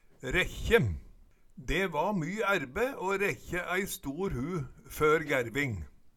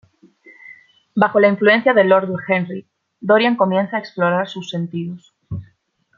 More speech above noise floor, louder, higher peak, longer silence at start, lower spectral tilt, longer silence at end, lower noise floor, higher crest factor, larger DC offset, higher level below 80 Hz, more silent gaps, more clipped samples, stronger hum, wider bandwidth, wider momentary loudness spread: second, 25 dB vs 44 dB; second, -31 LUFS vs -17 LUFS; second, -10 dBFS vs -2 dBFS; second, 0.2 s vs 0.7 s; second, -5 dB/octave vs -7 dB/octave; second, 0.05 s vs 0.55 s; second, -56 dBFS vs -60 dBFS; about the same, 22 dB vs 18 dB; neither; first, -46 dBFS vs -60 dBFS; neither; neither; neither; first, 18.5 kHz vs 7.2 kHz; second, 9 LU vs 19 LU